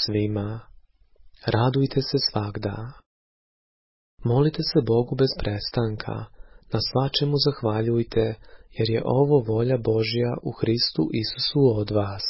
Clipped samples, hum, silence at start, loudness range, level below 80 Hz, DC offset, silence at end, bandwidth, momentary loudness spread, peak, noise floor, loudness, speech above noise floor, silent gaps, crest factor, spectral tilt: under 0.1%; none; 0 s; 4 LU; -46 dBFS; under 0.1%; 0 s; 5.8 kHz; 11 LU; -8 dBFS; -53 dBFS; -24 LUFS; 30 dB; 3.06-4.18 s; 18 dB; -9.5 dB/octave